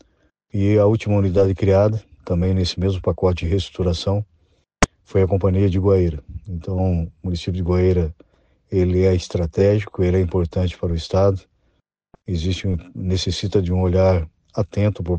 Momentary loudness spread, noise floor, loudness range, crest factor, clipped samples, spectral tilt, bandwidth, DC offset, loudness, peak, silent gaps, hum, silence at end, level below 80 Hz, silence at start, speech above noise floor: 10 LU; -66 dBFS; 3 LU; 14 dB; under 0.1%; -7 dB/octave; 9 kHz; under 0.1%; -20 LUFS; -4 dBFS; none; none; 0 s; -36 dBFS; 0.55 s; 48 dB